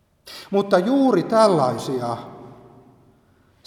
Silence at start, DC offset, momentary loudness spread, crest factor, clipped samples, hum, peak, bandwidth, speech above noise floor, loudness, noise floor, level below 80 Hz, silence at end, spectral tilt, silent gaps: 0.25 s; under 0.1%; 21 LU; 20 dB; under 0.1%; none; -2 dBFS; 14.5 kHz; 39 dB; -19 LUFS; -58 dBFS; -64 dBFS; 1.15 s; -6.5 dB/octave; none